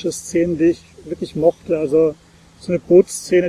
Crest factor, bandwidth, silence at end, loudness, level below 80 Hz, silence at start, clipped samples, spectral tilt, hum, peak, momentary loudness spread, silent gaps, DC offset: 16 dB; 14 kHz; 0 s; -17 LUFS; -50 dBFS; 0 s; under 0.1%; -6 dB/octave; none; -2 dBFS; 15 LU; none; under 0.1%